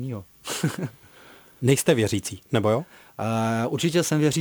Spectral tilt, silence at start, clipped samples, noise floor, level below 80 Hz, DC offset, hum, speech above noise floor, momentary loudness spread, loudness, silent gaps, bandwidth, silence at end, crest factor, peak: -5 dB/octave; 0 s; under 0.1%; -50 dBFS; -60 dBFS; under 0.1%; none; 27 dB; 13 LU; -24 LUFS; none; over 20 kHz; 0 s; 18 dB; -6 dBFS